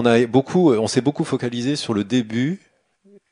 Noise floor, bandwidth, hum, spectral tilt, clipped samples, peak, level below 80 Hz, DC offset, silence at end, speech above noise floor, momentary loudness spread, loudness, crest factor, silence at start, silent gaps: -55 dBFS; 10.5 kHz; none; -6 dB/octave; under 0.1%; -2 dBFS; -62 dBFS; under 0.1%; 0.75 s; 36 dB; 7 LU; -20 LUFS; 18 dB; 0 s; none